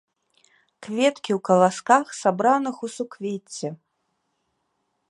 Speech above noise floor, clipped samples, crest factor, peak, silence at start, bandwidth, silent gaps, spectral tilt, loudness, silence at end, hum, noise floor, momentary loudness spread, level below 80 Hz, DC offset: 52 dB; under 0.1%; 22 dB; -2 dBFS; 0.8 s; 11.5 kHz; none; -5 dB/octave; -23 LUFS; 1.35 s; none; -74 dBFS; 14 LU; -76 dBFS; under 0.1%